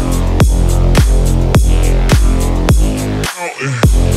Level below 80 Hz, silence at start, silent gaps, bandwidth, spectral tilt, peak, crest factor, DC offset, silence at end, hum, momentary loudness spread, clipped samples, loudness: -12 dBFS; 0 s; none; 15 kHz; -5.5 dB/octave; 0 dBFS; 10 dB; under 0.1%; 0 s; none; 6 LU; under 0.1%; -13 LUFS